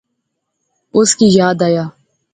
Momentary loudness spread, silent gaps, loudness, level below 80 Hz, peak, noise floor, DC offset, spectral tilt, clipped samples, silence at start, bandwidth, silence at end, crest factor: 9 LU; none; -12 LUFS; -54 dBFS; 0 dBFS; -72 dBFS; under 0.1%; -4.5 dB/octave; under 0.1%; 0.95 s; 9.6 kHz; 0.45 s; 14 dB